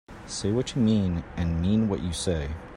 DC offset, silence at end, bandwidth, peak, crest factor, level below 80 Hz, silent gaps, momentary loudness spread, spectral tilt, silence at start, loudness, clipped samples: under 0.1%; 0 s; 12 kHz; -12 dBFS; 14 dB; -42 dBFS; none; 7 LU; -6 dB/octave; 0.1 s; -27 LUFS; under 0.1%